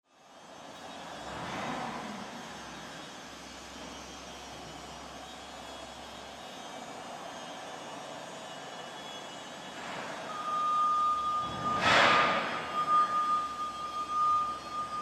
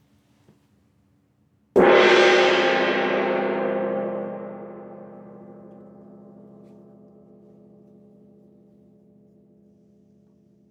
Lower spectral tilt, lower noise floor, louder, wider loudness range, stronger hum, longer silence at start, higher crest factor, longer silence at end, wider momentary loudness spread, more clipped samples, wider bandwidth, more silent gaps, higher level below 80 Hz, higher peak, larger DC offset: second, -3 dB/octave vs -4.5 dB/octave; second, -54 dBFS vs -64 dBFS; second, -31 LUFS vs -19 LUFS; second, 16 LU vs 19 LU; neither; second, 0.25 s vs 1.75 s; about the same, 22 dB vs 20 dB; second, 0 s vs 5.2 s; second, 18 LU vs 28 LU; neither; first, 13.5 kHz vs 8.8 kHz; neither; about the same, -64 dBFS vs -64 dBFS; second, -12 dBFS vs -4 dBFS; neither